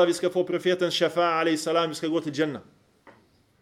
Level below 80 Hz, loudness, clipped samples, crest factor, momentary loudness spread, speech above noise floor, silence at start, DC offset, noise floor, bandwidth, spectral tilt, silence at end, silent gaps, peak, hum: -72 dBFS; -25 LUFS; under 0.1%; 16 dB; 6 LU; 36 dB; 0 s; under 0.1%; -60 dBFS; 15 kHz; -4.5 dB/octave; 0.5 s; none; -10 dBFS; none